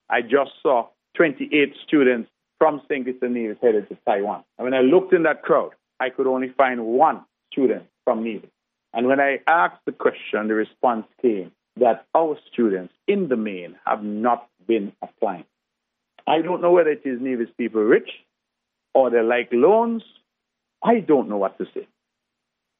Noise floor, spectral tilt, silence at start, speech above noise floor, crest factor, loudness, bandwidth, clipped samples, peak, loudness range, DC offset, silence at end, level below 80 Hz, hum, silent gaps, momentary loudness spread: -81 dBFS; -4 dB/octave; 0.1 s; 60 dB; 18 dB; -21 LUFS; 3.9 kHz; under 0.1%; -2 dBFS; 3 LU; under 0.1%; 0.95 s; -82 dBFS; none; none; 11 LU